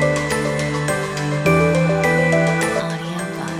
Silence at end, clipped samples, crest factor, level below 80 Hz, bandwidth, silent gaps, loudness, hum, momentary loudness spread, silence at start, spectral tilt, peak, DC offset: 0 s; under 0.1%; 14 dB; -42 dBFS; 15.5 kHz; none; -18 LUFS; none; 9 LU; 0 s; -5.5 dB/octave; -4 dBFS; under 0.1%